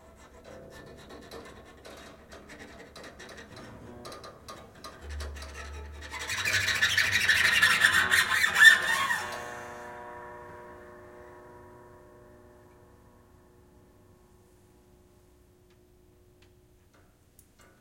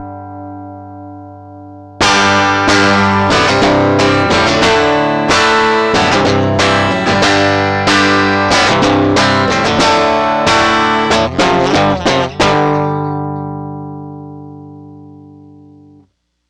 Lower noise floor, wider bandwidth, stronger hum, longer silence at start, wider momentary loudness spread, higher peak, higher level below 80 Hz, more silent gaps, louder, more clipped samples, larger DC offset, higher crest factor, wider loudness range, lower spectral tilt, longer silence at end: first, -61 dBFS vs -53 dBFS; first, 16.5 kHz vs 12 kHz; second, none vs 60 Hz at -50 dBFS; first, 0.45 s vs 0 s; first, 27 LU vs 19 LU; about the same, -4 dBFS vs -2 dBFS; second, -54 dBFS vs -38 dBFS; neither; second, -22 LUFS vs -11 LUFS; neither; neither; first, 28 dB vs 10 dB; first, 26 LU vs 7 LU; second, -0.5 dB/octave vs -4.5 dB/octave; first, 6.2 s vs 1.4 s